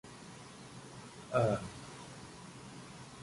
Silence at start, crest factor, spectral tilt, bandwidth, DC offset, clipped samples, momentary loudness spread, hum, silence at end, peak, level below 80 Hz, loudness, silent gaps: 0.05 s; 22 dB; -6 dB/octave; 11.5 kHz; under 0.1%; under 0.1%; 18 LU; none; 0 s; -18 dBFS; -64 dBFS; -39 LUFS; none